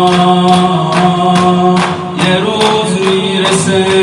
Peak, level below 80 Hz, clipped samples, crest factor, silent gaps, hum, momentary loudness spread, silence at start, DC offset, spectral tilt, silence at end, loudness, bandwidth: 0 dBFS; -48 dBFS; 0.4%; 10 dB; none; none; 3 LU; 0 s; under 0.1%; -5 dB/octave; 0 s; -10 LUFS; 11.5 kHz